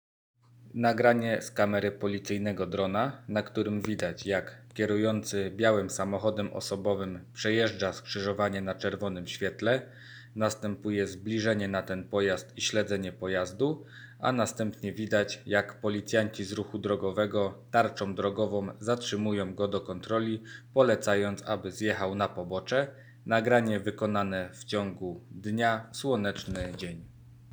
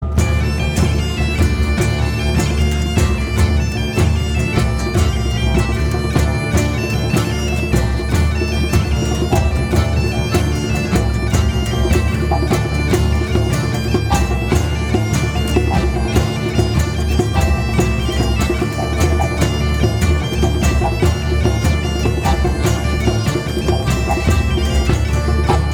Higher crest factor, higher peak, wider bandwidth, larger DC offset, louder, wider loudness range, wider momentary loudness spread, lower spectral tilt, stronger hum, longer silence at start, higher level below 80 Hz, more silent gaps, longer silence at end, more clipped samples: first, 22 dB vs 14 dB; second, -8 dBFS vs -2 dBFS; first, over 20 kHz vs 17.5 kHz; neither; second, -30 LUFS vs -17 LUFS; about the same, 2 LU vs 1 LU; first, 9 LU vs 2 LU; about the same, -5 dB/octave vs -6 dB/octave; neither; first, 0.6 s vs 0 s; second, -62 dBFS vs -20 dBFS; neither; about the same, 0 s vs 0 s; neither